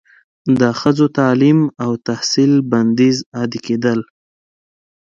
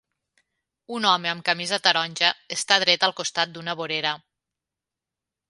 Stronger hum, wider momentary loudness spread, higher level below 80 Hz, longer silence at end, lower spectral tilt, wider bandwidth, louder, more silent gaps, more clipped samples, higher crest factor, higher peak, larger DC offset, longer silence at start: neither; about the same, 8 LU vs 9 LU; first, -56 dBFS vs -76 dBFS; second, 1.05 s vs 1.3 s; first, -6 dB/octave vs -1.5 dB/octave; second, 7.6 kHz vs 11.5 kHz; first, -15 LUFS vs -22 LUFS; first, 3.26-3.32 s vs none; neither; second, 16 dB vs 26 dB; about the same, 0 dBFS vs 0 dBFS; neither; second, 0.45 s vs 0.9 s